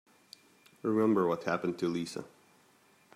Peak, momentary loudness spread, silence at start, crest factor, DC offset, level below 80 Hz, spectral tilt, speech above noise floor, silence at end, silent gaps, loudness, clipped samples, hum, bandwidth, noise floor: -16 dBFS; 12 LU; 0.85 s; 18 dB; under 0.1%; -80 dBFS; -6.5 dB/octave; 34 dB; 0.9 s; none; -32 LUFS; under 0.1%; none; 15 kHz; -65 dBFS